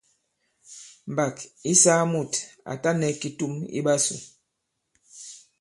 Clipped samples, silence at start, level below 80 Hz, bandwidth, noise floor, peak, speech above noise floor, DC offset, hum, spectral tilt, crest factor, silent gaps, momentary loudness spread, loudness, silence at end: under 0.1%; 0.7 s; -70 dBFS; 11.5 kHz; -79 dBFS; -4 dBFS; 55 dB; under 0.1%; none; -3.5 dB/octave; 24 dB; none; 24 LU; -23 LUFS; 0.2 s